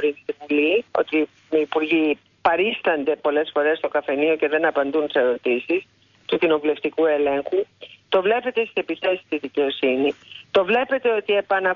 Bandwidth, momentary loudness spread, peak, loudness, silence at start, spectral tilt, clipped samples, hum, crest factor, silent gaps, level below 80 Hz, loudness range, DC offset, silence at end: 6 kHz; 5 LU; -6 dBFS; -21 LUFS; 0 s; -6 dB/octave; under 0.1%; none; 16 dB; none; -64 dBFS; 2 LU; under 0.1%; 0 s